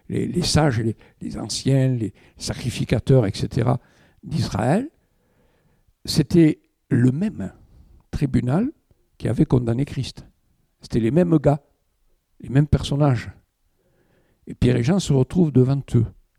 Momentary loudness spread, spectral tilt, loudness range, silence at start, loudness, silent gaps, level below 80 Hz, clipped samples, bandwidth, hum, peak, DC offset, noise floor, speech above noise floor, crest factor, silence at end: 14 LU; -6.5 dB/octave; 2 LU; 0.1 s; -21 LUFS; none; -42 dBFS; under 0.1%; 13.5 kHz; none; -4 dBFS; under 0.1%; -66 dBFS; 46 dB; 18 dB; 0.3 s